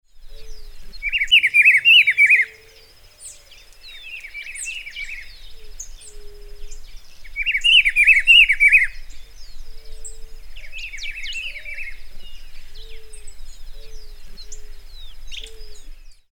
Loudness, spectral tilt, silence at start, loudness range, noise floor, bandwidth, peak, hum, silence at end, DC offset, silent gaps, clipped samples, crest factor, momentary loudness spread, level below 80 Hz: -13 LUFS; 2 dB/octave; 0.15 s; 19 LU; -47 dBFS; 18.5 kHz; -2 dBFS; none; 0.2 s; under 0.1%; none; under 0.1%; 18 dB; 27 LU; -36 dBFS